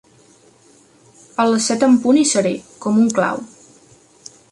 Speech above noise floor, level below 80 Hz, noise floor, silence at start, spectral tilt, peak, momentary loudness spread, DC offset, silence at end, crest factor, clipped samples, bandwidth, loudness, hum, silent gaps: 36 dB; -62 dBFS; -51 dBFS; 1.4 s; -4 dB/octave; -4 dBFS; 14 LU; under 0.1%; 1.05 s; 16 dB; under 0.1%; 11.5 kHz; -16 LUFS; none; none